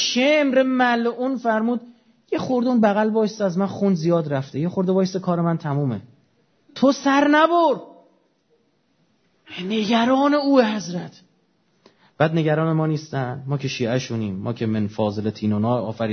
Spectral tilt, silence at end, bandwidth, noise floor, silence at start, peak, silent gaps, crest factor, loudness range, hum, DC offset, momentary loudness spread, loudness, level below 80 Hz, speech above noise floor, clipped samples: -6 dB/octave; 0 s; 6.6 kHz; -65 dBFS; 0 s; -2 dBFS; none; 18 dB; 4 LU; none; under 0.1%; 10 LU; -21 LUFS; -66 dBFS; 45 dB; under 0.1%